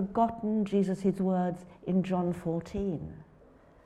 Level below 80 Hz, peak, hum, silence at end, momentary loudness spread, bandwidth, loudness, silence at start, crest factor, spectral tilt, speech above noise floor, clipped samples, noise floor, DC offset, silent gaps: -54 dBFS; -14 dBFS; none; 0.6 s; 7 LU; 10 kHz; -31 LUFS; 0 s; 16 dB; -9 dB/octave; 28 dB; under 0.1%; -58 dBFS; under 0.1%; none